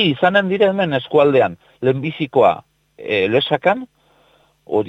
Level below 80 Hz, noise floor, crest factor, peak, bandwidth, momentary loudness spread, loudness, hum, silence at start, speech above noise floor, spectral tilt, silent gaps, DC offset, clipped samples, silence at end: -58 dBFS; -56 dBFS; 16 dB; -2 dBFS; 7.8 kHz; 8 LU; -17 LUFS; none; 0 s; 40 dB; -7.5 dB/octave; none; under 0.1%; under 0.1%; 0 s